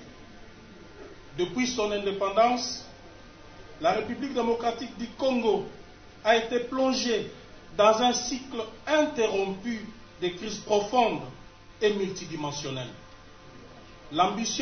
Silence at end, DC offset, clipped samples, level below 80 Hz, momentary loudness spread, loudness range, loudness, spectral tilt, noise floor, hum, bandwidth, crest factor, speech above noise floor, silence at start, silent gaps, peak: 0 s; under 0.1%; under 0.1%; -54 dBFS; 18 LU; 4 LU; -27 LUFS; -3.5 dB/octave; -49 dBFS; none; 6.6 kHz; 22 dB; 22 dB; 0 s; none; -8 dBFS